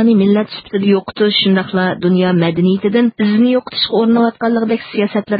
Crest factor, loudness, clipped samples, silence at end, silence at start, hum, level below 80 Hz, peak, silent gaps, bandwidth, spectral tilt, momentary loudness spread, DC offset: 12 dB; -14 LUFS; under 0.1%; 0 s; 0 s; none; -54 dBFS; -2 dBFS; none; 5 kHz; -12 dB/octave; 5 LU; under 0.1%